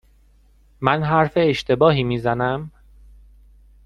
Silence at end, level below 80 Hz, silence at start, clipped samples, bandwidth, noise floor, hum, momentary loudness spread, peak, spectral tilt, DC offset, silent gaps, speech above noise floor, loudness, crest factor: 1.15 s; -46 dBFS; 0.8 s; under 0.1%; 9.8 kHz; -54 dBFS; none; 7 LU; 0 dBFS; -7 dB/octave; under 0.1%; none; 35 dB; -19 LUFS; 20 dB